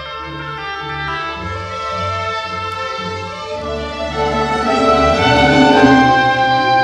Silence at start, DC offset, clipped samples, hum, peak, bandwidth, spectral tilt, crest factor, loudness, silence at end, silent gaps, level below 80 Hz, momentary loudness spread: 0 s; under 0.1%; under 0.1%; none; 0 dBFS; 10.5 kHz; -5 dB/octave; 16 dB; -15 LUFS; 0 s; none; -34 dBFS; 14 LU